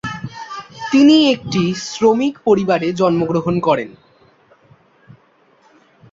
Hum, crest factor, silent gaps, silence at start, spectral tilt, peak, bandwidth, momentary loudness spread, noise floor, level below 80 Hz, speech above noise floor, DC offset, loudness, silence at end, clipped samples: none; 16 dB; none; 0.05 s; -5.5 dB/octave; -2 dBFS; 7.8 kHz; 19 LU; -54 dBFS; -54 dBFS; 40 dB; under 0.1%; -15 LUFS; 2.2 s; under 0.1%